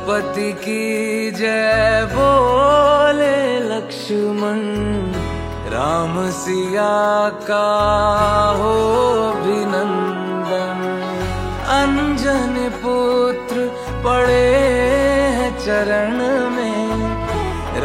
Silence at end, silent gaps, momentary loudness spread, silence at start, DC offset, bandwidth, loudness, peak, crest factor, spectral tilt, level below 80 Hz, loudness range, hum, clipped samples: 0 s; none; 9 LU; 0 s; under 0.1%; 16 kHz; -17 LUFS; -2 dBFS; 16 dB; -5.5 dB/octave; -34 dBFS; 4 LU; none; under 0.1%